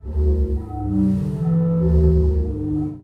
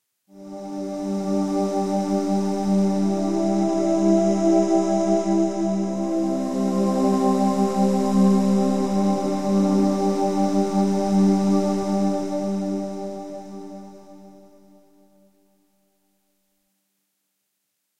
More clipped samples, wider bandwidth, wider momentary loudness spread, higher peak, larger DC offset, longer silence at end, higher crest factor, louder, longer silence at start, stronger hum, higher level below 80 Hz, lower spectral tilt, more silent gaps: neither; second, 2.1 kHz vs 12 kHz; second, 7 LU vs 12 LU; about the same, -6 dBFS vs -8 dBFS; second, under 0.1% vs 0.9%; about the same, 0.05 s vs 0 s; about the same, 14 dB vs 14 dB; about the same, -20 LUFS vs -21 LUFS; about the same, 0.05 s vs 0 s; neither; first, -22 dBFS vs -54 dBFS; first, -11.5 dB/octave vs -7.5 dB/octave; neither